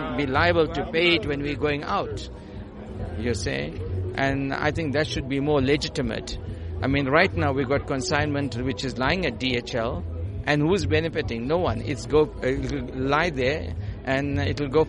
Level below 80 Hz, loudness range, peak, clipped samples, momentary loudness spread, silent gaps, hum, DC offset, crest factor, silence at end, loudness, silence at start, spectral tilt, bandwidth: -40 dBFS; 4 LU; -4 dBFS; under 0.1%; 11 LU; none; none; under 0.1%; 20 dB; 0 s; -25 LUFS; 0 s; -5.5 dB/octave; 11 kHz